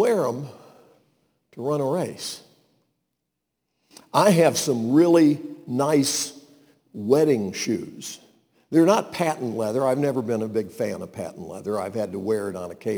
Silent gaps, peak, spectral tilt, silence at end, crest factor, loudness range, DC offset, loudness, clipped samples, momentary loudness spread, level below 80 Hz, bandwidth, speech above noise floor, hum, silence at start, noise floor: none; -4 dBFS; -5 dB/octave; 0 s; 20 dB; 9 LU; under 0.1%; -23 LUFS; under 0.1%; 16 LU; -70 dBFS; over 20 kHz; 58 dB; none; 0 s; -80 dBFS